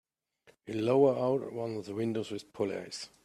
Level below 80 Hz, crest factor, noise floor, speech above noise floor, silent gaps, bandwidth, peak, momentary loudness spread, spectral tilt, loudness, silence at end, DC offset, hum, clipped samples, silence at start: -74 dBFS; 20 dB; -66 dBFS; 35 dB; none; 12.5 kHz; -14 dBFS; 14 LU; -6.5 dB/octave; -32 LUFS; 0.15 s; under 0.1%; none; under 0.1%; 0.65 s